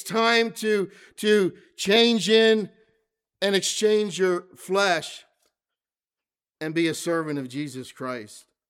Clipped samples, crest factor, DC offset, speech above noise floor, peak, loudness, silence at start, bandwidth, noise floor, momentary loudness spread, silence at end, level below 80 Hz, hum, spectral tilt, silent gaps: under 0.1%; 18 dB; under 0.1%; over 67 dB; -6 dBFS; -23 LUFS; 0 s; 16 kHz; under -90 dBFS; 16 LU; 0.3 s; -76 dBFS; none; -3.5 dB/octave; none